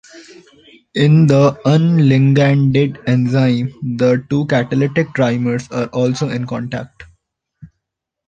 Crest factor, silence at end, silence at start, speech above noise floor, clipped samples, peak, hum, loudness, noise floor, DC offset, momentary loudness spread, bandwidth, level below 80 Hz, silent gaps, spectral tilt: 14 dB; 0.6 s; 0.15 s; 63 dB; under 0.1%; 0 dBFS; none; -15 LUFS; -78 dBFS; under 0.1%; 11 LU; 7.8 kHz; -52 dBFS; none; -7.5 dB/octave